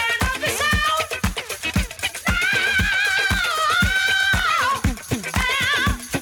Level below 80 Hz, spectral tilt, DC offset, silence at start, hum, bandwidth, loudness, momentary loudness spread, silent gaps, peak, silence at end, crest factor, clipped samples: -32 dBFS; -3 dB/octave; under 0.1%; 0 s; none; over 20 kHz; -19 LUFS; 7 LU; none; -8 dBFS; 0 s; 12 dB; under 0.1%